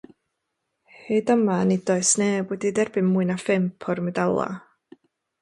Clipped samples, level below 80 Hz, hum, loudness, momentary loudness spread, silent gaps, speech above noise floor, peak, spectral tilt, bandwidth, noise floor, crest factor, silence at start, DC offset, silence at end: under 0.1%; -66 dBFS; none; -23 LUFS; 7 LU; none; 56 dB; -8 dBFS; -5 dB/octave; 11.5 kHz; -79 dBFS; 16 dB; 1.05 s; under 0.1%; 0.85 s